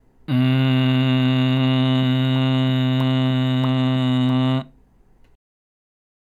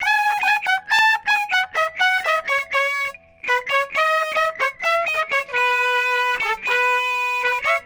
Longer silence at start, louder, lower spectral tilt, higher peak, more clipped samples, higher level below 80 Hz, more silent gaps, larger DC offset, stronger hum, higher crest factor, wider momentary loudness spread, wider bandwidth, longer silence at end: first, 0.3 s vs 0 s; about the same, -19 LUFS vs -19 LUFS; first, -8 dB/octave vs 0.5 dB/octave; about the same, -8 dBFS vs -6 dBFS; neither; about the same, -56 dBFS vs -60 dBFS; neither; neither; neither; about the same, 12 dB vs 14 dB; about the same, 2 LU vs 4 LU; second, 7.2 kHz vs over 20 kHz; first, 1.7 s vs 0 s